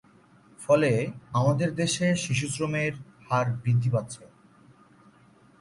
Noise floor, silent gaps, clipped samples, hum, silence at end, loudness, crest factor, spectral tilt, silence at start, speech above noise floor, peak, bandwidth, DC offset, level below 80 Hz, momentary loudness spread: -57 dBFS; none; under 0.1%; none; 1.35 s; -26 LUFS; 18 dB; -5.5 dB/octave; 0.6 s; 32 dB; -10 dBFS; 11.5 kHz; under 0.1%; -60 dBFS; 10 LU